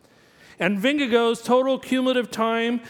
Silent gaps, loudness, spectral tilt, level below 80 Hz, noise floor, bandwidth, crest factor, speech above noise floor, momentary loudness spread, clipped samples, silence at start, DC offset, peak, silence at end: none; -22 LUFS; -4.5 dB/octave; -68 dBFS; -53 dBFS; 17 kHz; 16 dB; 32 dB; 4 LU; under 0.1%; 0.6 s; under 0.1%; -6 dBFS; 0 s